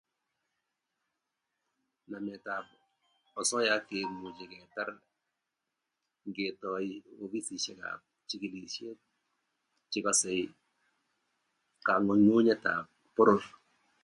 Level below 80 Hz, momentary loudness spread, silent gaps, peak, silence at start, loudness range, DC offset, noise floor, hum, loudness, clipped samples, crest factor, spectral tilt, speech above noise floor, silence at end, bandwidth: -74 dBFS; 19 LU; none; -8 dBFS; 2.1 s; 11 LU; under 0.1%; -86 dBFS; none; -31 LUFS; under 0.1%; 26 dB; -3.5 dB/octave; 55 dB; 0.55 s; 11 kHz